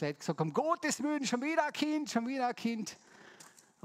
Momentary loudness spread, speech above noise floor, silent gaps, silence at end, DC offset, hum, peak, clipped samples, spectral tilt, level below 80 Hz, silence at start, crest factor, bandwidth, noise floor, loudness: 12 LU; 25 dB; none; 0.35 s; under 0.1%; none; -14 dBFS; under 0.1%; -4.5 dB/octave; -82 dBFS; 0 s; 20 dB; 16 kHz; -59 dBFS; -34 LUFS